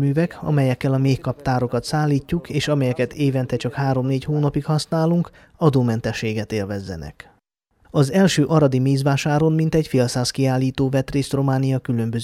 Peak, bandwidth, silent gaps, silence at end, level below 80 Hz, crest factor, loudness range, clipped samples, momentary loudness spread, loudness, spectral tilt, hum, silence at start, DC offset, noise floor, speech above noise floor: -4 dBFS; 14 kHz; none; 0 s; -46 dBFS; 16 dB; 3 LU; under 0.1%; 8 LU; -20 LUFS; -6.5 dB/octave; none; 0 s; under 0.1%; -64 dBFS; 44 dB